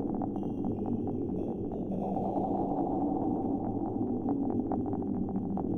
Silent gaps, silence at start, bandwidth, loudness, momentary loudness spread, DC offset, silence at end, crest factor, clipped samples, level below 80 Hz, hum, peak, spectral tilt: none; 0 s; 3.5 kHz; -33 LUFS; 3 LU; under 0.1%; 0 s; 14 dB; under 0.1%; -52 dBFS; none; -18 dBFS; -12 dB/octave